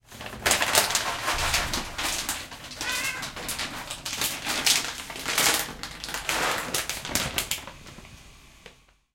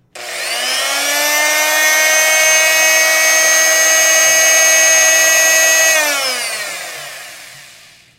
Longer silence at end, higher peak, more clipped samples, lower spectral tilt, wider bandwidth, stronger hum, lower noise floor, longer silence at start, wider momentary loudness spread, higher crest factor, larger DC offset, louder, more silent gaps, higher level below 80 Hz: second, 0.4 s vs 0.55 s; about the same, -2 dBFS vs 0 dBFS; neither; first, -0.5 dB/octave vs 3 dB/octave; about the same, 17 kHz vs 17 kHz; neither; first, -53 dBFS vs -42 dBFS; about the same, 0.1 s vs 0.15 s; about the same, 12 LU vs 14 LU; first, 28 dB vs 12 dB; neither; second, -26 LUFS vs -9 LUFS; neither; first, -46 dBFS vs -68 dBFS